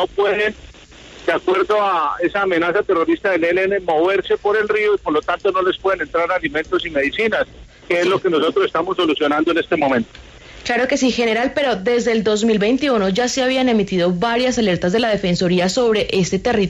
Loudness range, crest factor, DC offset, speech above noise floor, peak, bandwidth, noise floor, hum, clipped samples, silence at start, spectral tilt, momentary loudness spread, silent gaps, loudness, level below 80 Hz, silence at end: 2 LU; 12 dB; under 0.1%; 23 dB; -6 dBFS; 10.5 kHz; -40 dBFS; none; under 0.1%; 0 s; -4.5 dB/octave; 4 LU; none; -17 LUFS; -46 dBFS; 0 s